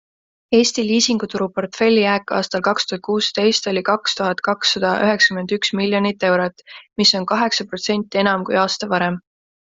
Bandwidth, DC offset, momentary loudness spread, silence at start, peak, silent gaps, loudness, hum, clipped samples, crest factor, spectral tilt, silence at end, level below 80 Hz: 7.8 kHz; under 0.1%; 6 LU; 0.5 s; 0 dBFS; none; -18 LUFS; none; under 0.1%; 18 dB; -3.5 dB/octave; 0.5 s; -60 dBFS